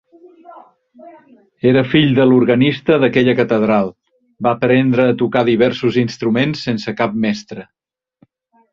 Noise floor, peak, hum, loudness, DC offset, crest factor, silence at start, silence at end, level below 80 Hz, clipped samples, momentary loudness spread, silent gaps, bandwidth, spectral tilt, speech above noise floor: -56 dBFS; 0 dBFS; none; -15 LUFS; under 0.1%; 16 dB; 0.5 s; 1.1 s; -52 dBFS; under 0.1%; 9 LU; none; 7.2 kHz; -7.5 dB/octave; 42 dB